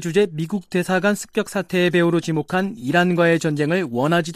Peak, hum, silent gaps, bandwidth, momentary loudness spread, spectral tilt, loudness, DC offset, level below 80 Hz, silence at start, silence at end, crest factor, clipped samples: -4 dBFS; none; none; 15 kHz; 6 LU; -6 dB/octave; -20 LUFS; under 0.1%; -60 dBFS; 0 s; 0 s; 14 dB; under 0.1%